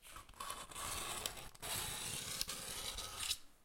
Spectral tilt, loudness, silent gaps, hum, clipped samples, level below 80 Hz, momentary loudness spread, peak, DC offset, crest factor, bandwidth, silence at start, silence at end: -0.5 dB/octave; -43 LUFS; none; none; under 0.1%; -60 dBFS; 7 LU; -20 dBFS; under 0.1%; 26 dB; 16.5 kHz; 0 s; 0 s